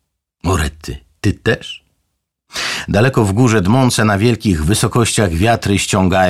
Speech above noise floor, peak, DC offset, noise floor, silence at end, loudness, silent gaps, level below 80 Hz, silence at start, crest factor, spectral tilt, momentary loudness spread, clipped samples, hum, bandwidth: 57 dB; -2 dBFS; 0.4%; -70 dBFS; 0 s; -15 LUFS; none; -32 dBFS; 0.45 s; 14 dB; -5 dB/octave; 11 LU; under 0.1%; none; 15 kHz